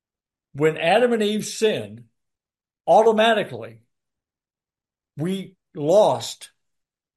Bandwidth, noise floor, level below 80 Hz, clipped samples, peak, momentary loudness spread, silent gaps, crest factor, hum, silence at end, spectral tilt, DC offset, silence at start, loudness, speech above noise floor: 12.5 kHz; under -90 dBFS; -70 dBFS; under 0.1%; -6 dBFS; 20 LU; none; 18 dB; none; 0.7 s; -4.5 dB/octave; under 0.1%; 0.55 s; -20 LUFS; over 70 dB